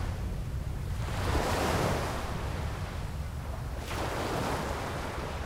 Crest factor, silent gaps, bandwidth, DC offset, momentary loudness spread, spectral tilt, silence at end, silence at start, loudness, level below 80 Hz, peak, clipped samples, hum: 16 dB; none; 16 kHz; under 0.1%; 9 LU; -5 dB/octave; 0 s; 0 s; -34 LUFS; -38 dBFS; -16 dBFS; under 0.1%; none